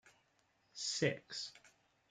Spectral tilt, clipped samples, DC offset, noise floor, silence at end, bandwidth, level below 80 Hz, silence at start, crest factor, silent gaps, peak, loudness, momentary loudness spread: -3 dB/octave; under 0.1%; under 0.1%; -77 dBFS; 0.45 s; 11 kHz; -82 dBFS; 0.05 s; 24 dB; none; -20 dBFS; -40 LUFS; 13 LU